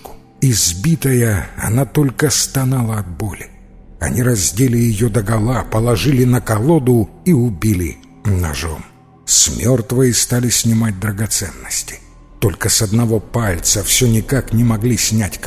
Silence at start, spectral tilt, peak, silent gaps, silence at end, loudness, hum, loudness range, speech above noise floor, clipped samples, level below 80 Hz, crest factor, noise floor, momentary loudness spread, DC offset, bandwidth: 0.05 s; -4.5 dB/octave; 0 dBFS; none; 0 s; -15 LUFS; none; 2 LU; 22 dB; under 0.1%; -32 dBFS; 16 dB; -36 dBFS; 9 LU; under 0.1%; 16 kHz